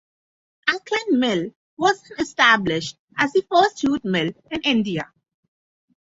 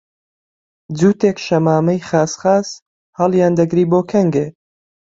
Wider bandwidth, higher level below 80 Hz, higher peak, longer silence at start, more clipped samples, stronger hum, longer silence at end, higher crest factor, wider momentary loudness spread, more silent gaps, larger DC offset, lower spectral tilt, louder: about the same, 8 kHz vs 7.8 kHz; about the same, -58 dBFS vs -56 dBFS; about the same, -2 dBFS vs 0 dBFS; second, 0.65 s vs 0.9 s; neither; neither; first, 1.1 s vs 0.65 s; about the same, 20 dB vs 16 dB; about the same, 11 LU vs 9 LU; about the same, 1.56-1.77 s, 2.99-3.08 s vs 2.82-3.13 s; neither; second, -4.5 dB/octave vs -7 dB/octave; second, -21 LUFS vs -15 LUFS